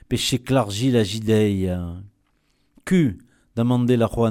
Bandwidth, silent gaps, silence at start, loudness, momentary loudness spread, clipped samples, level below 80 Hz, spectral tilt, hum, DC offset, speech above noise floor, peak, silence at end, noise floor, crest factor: 16 kHz; none; 0.1 s; -21 LUFS; 14 LU; under 0.1%; -46 dBFS; -6 dB/octave; none; under 0.1%; 45 dB; -6 dBFS; 0 s; -65 dBFS; 14 dB